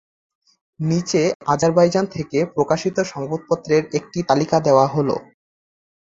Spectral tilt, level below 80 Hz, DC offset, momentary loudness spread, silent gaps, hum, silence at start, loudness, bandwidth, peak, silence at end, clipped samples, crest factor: -6 dB/octave; -56 dBFS; under 0.1%; 9 LU; 1.35-1.40 s; none; 0.8 s; -19 LUFS; 8 kHz; -2 dBFS; 0.95 s; under 0.1%; 18 dB